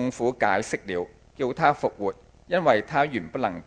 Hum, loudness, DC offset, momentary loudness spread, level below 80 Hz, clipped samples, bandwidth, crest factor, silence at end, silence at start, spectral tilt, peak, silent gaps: none; -25 LUFS; under 0.1%; 10 LU; -56 dBFS; under 0.1%; 10 kHz; 22 dB; 0.05 s; 0 s; -5.5 dB/octave; -4 dBFS; none